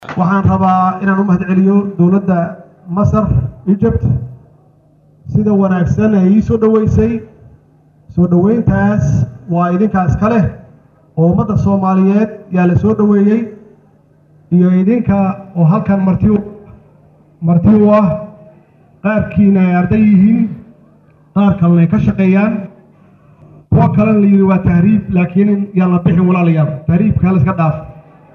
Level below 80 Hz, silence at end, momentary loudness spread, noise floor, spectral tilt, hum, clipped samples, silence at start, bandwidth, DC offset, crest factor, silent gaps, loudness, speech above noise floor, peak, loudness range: -34 dBFS; 0.35 s; 7 LU; -48 dBFS; -10.5 dB/octave; none; under 0.1%; 0 s; 6.6 kHz; under 0.1%; 10 dB; none; -12 LUFS; 37 dB; -2 dBFS; 3 LU